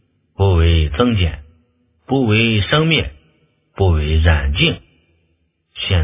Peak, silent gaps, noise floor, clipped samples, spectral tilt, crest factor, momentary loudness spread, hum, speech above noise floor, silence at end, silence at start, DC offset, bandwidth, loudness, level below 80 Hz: 0 dBFS; none; -64 dBFS; under 0.1%; -10.5 dB/octave; 16 dB; 11 LU; none; 49 dB; 0 s; 0.4 s; under 0.1%; 3.9 kHz; -16 LUFS; -22 dBFS